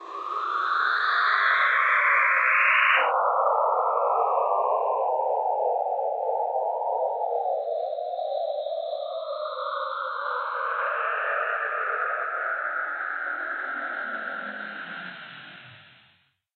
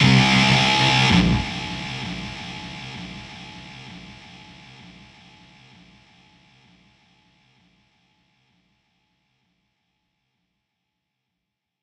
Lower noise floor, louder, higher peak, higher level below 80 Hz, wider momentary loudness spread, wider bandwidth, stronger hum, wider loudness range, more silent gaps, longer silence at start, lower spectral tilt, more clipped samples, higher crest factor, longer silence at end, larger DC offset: second, -64 dBFS vs -82 dBFS; second, -25 LUFS vs -19 LUFS; second, -8 dBFS vs -4 dBFS; second, under -90 dBFS vs -42 dBFS; second, 12 LU vs 27 LU; second, 7.8 kHz vs 11 kHz; neither; second, 10 LU vs 27 LU; neither; about the same, 0 s vs 0 s; second, -3 dB/octave vs -4.5 dB/octave; neither; about the same, 18 dB vs 22 dB; second, 0.75 s vs 7.7 s; neither